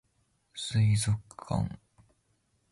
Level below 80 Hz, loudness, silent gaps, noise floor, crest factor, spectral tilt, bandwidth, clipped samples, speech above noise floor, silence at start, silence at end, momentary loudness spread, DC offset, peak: -52 dBFS; -30 LUFS; none; -73 dBFS; 14 dB; -5 dB/octave; 11.5 kHz; under 0.1%; 44 dB; 0.55 s; 0.95 s; 17 LU; under 0.1%; -18 dBFS